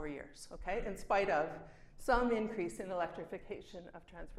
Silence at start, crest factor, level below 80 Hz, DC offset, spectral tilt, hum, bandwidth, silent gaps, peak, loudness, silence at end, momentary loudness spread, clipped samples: 0 s; 20 dB; -52 dBFS; under 0.1%; -5 dB/octave; none; 14.5 kHz; none; -18 dBFS; -38 LUFS; 0 s; 19 LU; under 0.1%